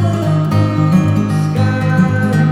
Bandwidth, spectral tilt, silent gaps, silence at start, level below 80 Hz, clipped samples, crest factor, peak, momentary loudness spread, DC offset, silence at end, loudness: 12.5 kHz; -8 dB/octave; none; 0 s; -42 dBFS; under 0.1%; 10 dB; -2 dBFS; 2 LU; under 0.1%; 0 s; -14 LUFS